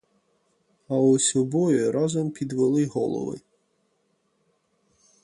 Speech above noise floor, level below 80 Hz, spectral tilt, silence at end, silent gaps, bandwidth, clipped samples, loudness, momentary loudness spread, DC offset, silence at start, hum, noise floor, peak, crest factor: 48 dB; -66 dBFS; -5.5 dB/octave; 1.85 s; none; 11.5 kHz; under 0.1%; -23 LUFS; 10 LU; under 0.1%; 0.9 s; none; -70 dBFS; -10 dBFS; 16 dB